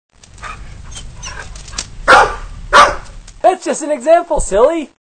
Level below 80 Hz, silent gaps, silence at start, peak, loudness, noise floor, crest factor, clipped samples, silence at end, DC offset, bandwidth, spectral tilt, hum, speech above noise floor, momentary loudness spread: -30 dBFS; none; 0.4 s; 0 dBFS; -12 LUFS; -32 dBFS; 14 dB; 0.6%; 0.15 s; 0.3%; 11 kHz; -3 dB/octave; none; 18 dB; 23 LU